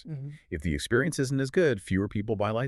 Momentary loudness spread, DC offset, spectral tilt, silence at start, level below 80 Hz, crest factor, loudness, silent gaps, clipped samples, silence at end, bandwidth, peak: 12 LU; under 0.1%; -6 dB/octave; 0.05 s; -46 dBFS; 16 dB; -28 LUFS; none; under 0.1%; 0 s; 13 kHz; -12 dBFS